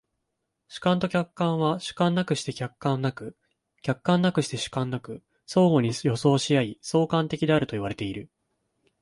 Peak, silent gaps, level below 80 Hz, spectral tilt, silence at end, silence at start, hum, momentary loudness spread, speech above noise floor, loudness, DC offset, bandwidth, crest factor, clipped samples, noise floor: -8 dBFS; none; -60 dBFS; -6 dB/octave; 0.75 s; 0.7 s; none; 12 LU; 55 dB; -26 LUFS; under 0.1%; 11.5 kHz; 18 dB; under 0.1%; -80 dBFS